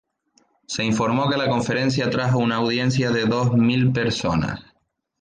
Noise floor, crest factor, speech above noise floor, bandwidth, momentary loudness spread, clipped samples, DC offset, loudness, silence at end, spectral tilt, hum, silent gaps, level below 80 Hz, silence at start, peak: -69 dBFS; 14 dB; 48 dB; 9.6 kHz; 6 LU; under 0.1%; under 0.1%; -21 LUFS; 0.6 s; -6 dB/octave; none; none; -48 dBFS; 0.7 s; -8 dBFS